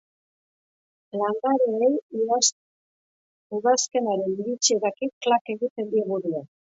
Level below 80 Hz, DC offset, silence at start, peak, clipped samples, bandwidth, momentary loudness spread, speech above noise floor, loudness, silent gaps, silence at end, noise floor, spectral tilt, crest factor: -78 dBFS; under 0.1%; 1.15 s; -6 dBFS; under 0.1%; 8 kHz; 7 LU; over 66 dB; -24 LUFS; 2.02-2.10 s, 2.52-3.50 s, 5.13-5.21 s, 5.41-5.45 s, 5.70-5.76 s; 0.2 s; under -90 dBFS; -2.5 dB/octave; 20 dB